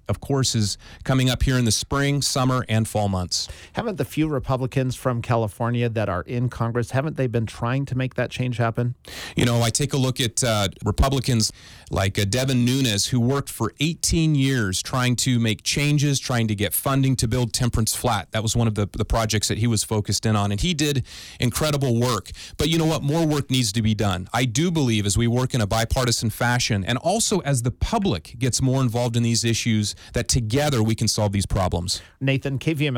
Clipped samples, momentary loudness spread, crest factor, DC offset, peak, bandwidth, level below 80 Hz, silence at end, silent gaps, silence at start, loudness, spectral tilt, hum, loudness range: under 0.1%; 5 LU; 14 dB; under 0.1%; -8 dBFS; 18.5 kHz; -38 dBFS; 0 s; none; 0.1 s; -22 LUFS; -4.5 dB/octave; none; 3 LU